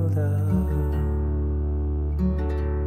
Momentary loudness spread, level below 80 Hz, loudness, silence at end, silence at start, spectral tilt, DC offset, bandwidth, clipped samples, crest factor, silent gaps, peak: 3 LU; -26 dBFS; -25 LUFS; 0 s; 0 s; -10 dB/octave; under 0.1%; 3 kHz; under 0.1%; 12 dB; none; -12 dBFS